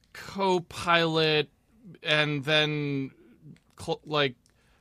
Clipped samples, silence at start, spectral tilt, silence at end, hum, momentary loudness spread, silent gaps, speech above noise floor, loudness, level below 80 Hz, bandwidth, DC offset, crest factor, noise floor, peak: under 0.1%; 0.15 s; -5 dB/octave; 0.45 s; none; 13 LU; none; 26 dB; -26 LUFS; -62 dBFS; 15 kHz; under 0.1%; 22 dB; -53 dBFS; -6 dBFS